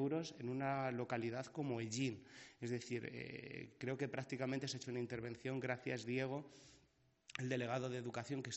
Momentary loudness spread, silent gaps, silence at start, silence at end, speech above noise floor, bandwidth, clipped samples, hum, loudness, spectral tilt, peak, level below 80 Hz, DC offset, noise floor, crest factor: 9 LU; none; 0 s; 0 s; 31 dB; 8 kHz; under 0.1%; none; -44 LUFS; -5 dB/octave; -26 dBFS; -80 dBFS; under 0.1%; -75 dBFS; 18 dB